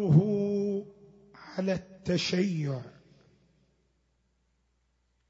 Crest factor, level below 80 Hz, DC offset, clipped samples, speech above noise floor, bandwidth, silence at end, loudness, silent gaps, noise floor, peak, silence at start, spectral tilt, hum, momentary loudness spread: 22 dB; -64 dBFS; under 0.1%; under 0.1%; 46 dB; 7.8 kHz; 2.4 s; -30 LUFS; none; -73 dBFS; -10 dBFS; 0 s; -7 dB/octave; none; 15 LU